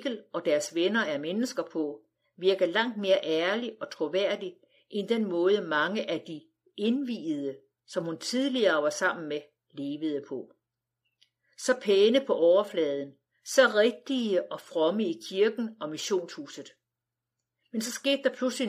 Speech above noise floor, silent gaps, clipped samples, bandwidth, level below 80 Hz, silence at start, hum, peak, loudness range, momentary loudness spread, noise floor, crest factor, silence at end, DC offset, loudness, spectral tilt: 60 dB; none; under 0.1%; 15 kHz; under -90 dBFS; 0 s; none; -8 dBFS; 6 LU; 15 LU; -88 dBFS; 20 dB; 0 s; under 0.1%; -28 LUFS; -3.5 dB/octave